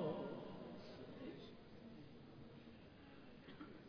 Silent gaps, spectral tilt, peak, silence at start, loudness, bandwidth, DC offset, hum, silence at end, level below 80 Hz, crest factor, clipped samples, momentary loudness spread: none; -6 dB/octave; -32 dBFS; 0 s; -55 LUFS; 5.4 kHz; under 0.1%; none; 0 s; -74 dBFS; 20 dB; under 0.1%; 11 LU